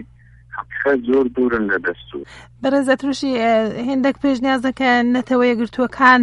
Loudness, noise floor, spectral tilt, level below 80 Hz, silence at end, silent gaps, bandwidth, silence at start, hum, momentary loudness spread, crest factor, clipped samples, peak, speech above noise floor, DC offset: -18 LUFS; -46 dBFS; -5 dB/octave; -50 dBFS; 0 s; none; 11.5 kHz; 0 s; none; 14 LU; 18 dB; under 0.1%; 0 dBFS; 29 dB; under 0.1%